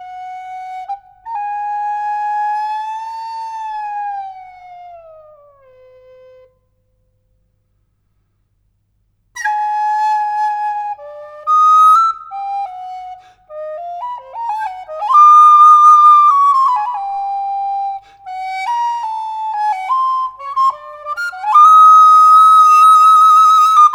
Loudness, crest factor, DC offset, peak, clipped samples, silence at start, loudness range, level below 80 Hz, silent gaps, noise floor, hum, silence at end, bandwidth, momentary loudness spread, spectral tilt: -10 LUFS; 12 dB; under 0.1%; 0 dBFS; under 0.1%; 0 s; 17 LU; -64 dBFS; none; -62 dBFS; none; 0 s; 13 kHz; 23 LU; 1.5 dB/octave